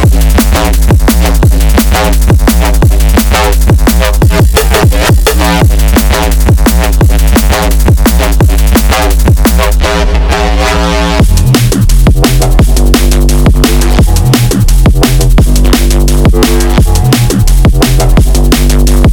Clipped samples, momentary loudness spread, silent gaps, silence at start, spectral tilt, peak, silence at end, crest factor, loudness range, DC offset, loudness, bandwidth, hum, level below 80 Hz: 0.2%; 2 LU; none; 0 s; -5 dB/octave; 0 dBFS; 0 s; 4 dB; 1 LU; under 0.1%; -7 LUFS; over 20 kHz; none; -6 dBFS